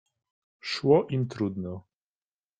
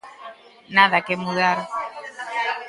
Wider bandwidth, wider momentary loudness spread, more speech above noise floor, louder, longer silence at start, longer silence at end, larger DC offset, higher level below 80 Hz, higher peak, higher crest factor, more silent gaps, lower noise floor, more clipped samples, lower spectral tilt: second, 9.2 kHz vs 11.5 kHz; second, 17 LU vs 23 LU; first, over 64 dB vs 23 dB; second, -27 LUFS vs -20 LUFS; first, 0.65 s vs 0.05 s; first, 0.8 s vs 0 s; neither; about the same, -68 dBFS vs -68 dBFS; second, -8 dBFS vs 0 dBFS; about the same, 22 dB vs 22 dB; neither; first, under -90 dBFS vs -42 dBFS; neither; first, -7 dB/octave vs -4.5 dB/octave